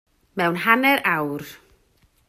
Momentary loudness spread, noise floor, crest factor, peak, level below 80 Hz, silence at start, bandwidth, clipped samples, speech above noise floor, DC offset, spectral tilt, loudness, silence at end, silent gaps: 18 LU; -61 dBFS; 22 dB; 0 dBFS; -64 dBFS; 0.35 s; 16 kHz; under 0.1%; 41 dB; under 0.1%; -5 dB/octave; -20 LUFS; 0.7 s; none